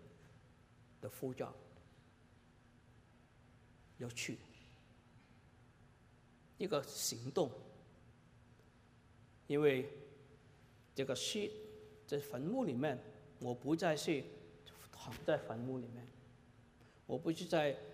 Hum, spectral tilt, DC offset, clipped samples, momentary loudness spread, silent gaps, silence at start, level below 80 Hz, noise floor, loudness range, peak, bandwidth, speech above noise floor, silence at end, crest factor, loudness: none; -4.5 dB/octave; under 0.1%; under 0.1%; 23 LU; none; 0 s; -74 dBFS; -67 dBFS; 11 LU; -20 dBFS; 15.5 kHz; 27 dB; 0 s; 22 dB; -41 LUFS